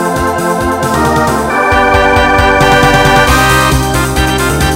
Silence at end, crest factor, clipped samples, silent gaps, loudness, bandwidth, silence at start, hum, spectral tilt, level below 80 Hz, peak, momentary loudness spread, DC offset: 0 s; 8 dB; 0.4%; none; -9 LUFS; 16.5 kHz; 0 s; none; -4.5 dB/octave; -20 dBFS; 0 dBFS; 6 LU; under 0.1%